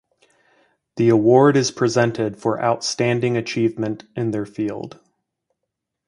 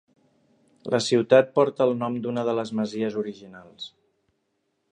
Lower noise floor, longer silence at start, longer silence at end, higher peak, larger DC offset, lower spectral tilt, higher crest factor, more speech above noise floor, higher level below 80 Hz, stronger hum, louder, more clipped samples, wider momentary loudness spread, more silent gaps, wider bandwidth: first, -80 dBFS vs -74 dBFS; about the same, 0.95 s vs 0.85 s; first, 1.2 s vs 1.05 s; first, 0 dBFS vs -4 dBFS; neither; about the same, -5.5 dB/octave vs -5.5 dB/octave; about the same, 20 dB vs 20 dB; first, 61 dB vs 51 dB; first, -60 dBFS vs -72 dBFS; neither; first, -19 LUFS vs -24 LUFS; neither; second, 13 LU vs 21 LU; neither; about the same, 11 kHz vs 10 kHz